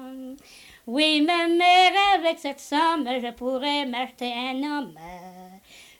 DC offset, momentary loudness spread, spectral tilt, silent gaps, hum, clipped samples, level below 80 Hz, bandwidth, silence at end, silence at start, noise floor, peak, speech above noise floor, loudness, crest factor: under 0.1%; 23 LU; -2.5 dB/octave; none; none; under 0.1%; -62 dBFS; 18 kHz; 0.2 s; 0 s; -50 dBFS; -8 dBFS; 27 dB; -22 LUFS; 16 dB